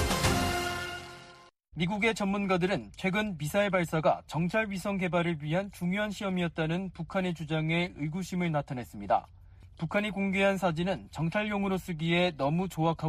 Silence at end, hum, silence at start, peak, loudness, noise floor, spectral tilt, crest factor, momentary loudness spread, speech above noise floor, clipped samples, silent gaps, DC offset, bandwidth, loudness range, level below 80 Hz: 0 s; none; 0 s; -12 dBFS; -30 LUFS; -55 dBFS; -5.5 dB/octave; 18 dB; 7 LU; 25 dB; under 0.1%; none; under 0.1%; 15 kHz; 3 LU; -50 dBFS